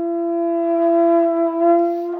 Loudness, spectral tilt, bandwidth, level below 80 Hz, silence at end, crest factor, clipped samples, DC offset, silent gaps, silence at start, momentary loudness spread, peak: -17 LUFS; -7.5 dB/octave; 3 kHz; -80 dBFS; 0 s; 12 dB; under 0.1%; under 0.1%; none; 0 s; 5 LU; -6 dBFS